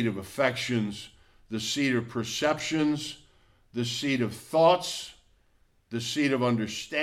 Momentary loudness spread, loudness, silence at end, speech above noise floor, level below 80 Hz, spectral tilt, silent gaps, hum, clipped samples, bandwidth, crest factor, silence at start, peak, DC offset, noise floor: 15 LU; -28 LUFS; 0 s; 37 dB; -62 dBFS; -4.5 dB/octave; none; none; under 0.1%; 15.5 kHz; 20 dB; 0 s; -10 dBFS; under 0.1%; -65 dBFS